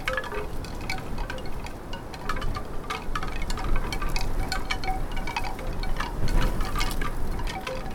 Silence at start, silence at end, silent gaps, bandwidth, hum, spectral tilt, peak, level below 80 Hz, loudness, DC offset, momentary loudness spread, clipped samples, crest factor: 0 s; 0 s; none; 16.5 kHz; none; -4.5 dB/octave; -10 dBFS; -28 dBFS; -32 LUFS; under 0.1%; 6 LU; under 0.1%; 16 dB